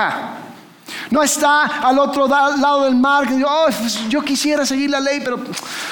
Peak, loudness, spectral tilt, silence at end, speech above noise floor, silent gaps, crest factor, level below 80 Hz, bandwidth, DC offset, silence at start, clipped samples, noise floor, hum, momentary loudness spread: -4 dBFS; -16 LUFS; -2.5 dB/octave; 0 s; 21 dB; none; 14 dB; -58 dBFS; 19.5 kHz; 0.1%; 0 s; under 0.1%; -37 dBFS; none; 11 LU